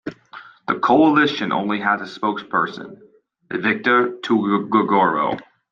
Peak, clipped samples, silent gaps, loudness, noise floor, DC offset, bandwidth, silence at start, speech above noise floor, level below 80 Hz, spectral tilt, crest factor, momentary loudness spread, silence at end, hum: -4 dBFS; under 0.1%; none; -19 LUFS; -42 dBFS; under 0.1%; 7.2 kHz; 0.05 s; 24 dB; -66 dBFS; -6.5 dB/octave; 16 dB; 15 LU; 0.3 s; none